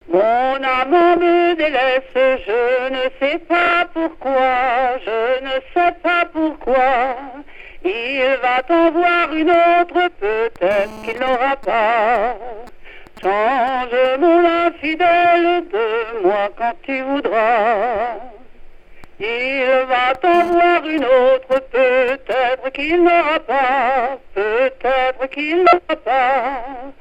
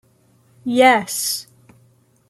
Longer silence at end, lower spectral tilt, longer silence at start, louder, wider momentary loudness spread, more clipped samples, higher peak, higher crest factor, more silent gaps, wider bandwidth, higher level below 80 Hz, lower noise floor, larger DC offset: second, 0.1 s vs 0.85 s; first, -5 dB/octave vs -2 dB/octave; second, 0.05 s vs 0.65 s; about the same, -16 LUFS vs -17 LUFS; second, 9 LU vs 13 LU; neither; about the same, 0 dBFS vs -2 dBFS; about the same, 16 dB vs 18 dB; neither; second, 8.2 kHz vs 15.5 kHz; first, -44 dBFS vs -66 dBFS; second, -37 dBFS vs -56 dBFS; first, 0.1% vs under 0.1%